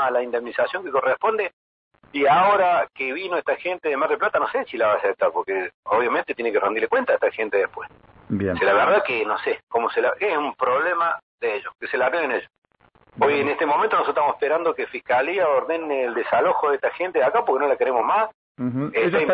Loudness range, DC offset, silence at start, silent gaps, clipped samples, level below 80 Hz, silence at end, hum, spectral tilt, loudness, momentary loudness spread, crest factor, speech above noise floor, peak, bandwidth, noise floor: 2 LU; under 0.1%; 0 s; 1.53-1.91 s, 5.74-5.83 s, 9.63-9.67 s, 11.23-11.38 s, 12.58-12.62 s, 18.34-18.55 s; under 0.1%; -64 dBFS; 0 s; none; -9 dB/octave; -22 LUFS; 8 LU; 14 dB; 37 dB; -8 dBFS; 5.2 kHz; -58 dBFS